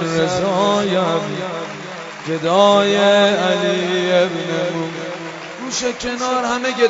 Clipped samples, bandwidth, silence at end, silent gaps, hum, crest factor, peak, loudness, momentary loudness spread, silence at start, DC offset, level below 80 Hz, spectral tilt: under 0.1%; 8 kHz; 0 s; none; none; 18 dB; 0 dBFS; -17 LUFS; 15 LU; 0 s; under 0.1%; -54 dBFS; -4 dB/octave